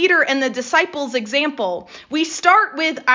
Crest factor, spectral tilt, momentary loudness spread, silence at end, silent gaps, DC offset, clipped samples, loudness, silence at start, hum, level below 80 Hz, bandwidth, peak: 16 dB; -2 dB/octave; 10 LU; 0 s; none; under 0.1%; under 0.1%; -18 LUFS; 0 s; none; -66 dBFS; 7.6 kHz; -2 dBFS